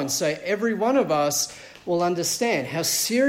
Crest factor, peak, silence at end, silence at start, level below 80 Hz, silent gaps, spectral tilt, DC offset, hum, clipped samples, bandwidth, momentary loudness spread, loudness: 14 dB; -10 dBFS; 0 s; 0 s; -62 dBFS; none; -3 dB/octave; under 0.1%; none; under 0.1%; 16.5 kHz; 5 LU; -23 LUFS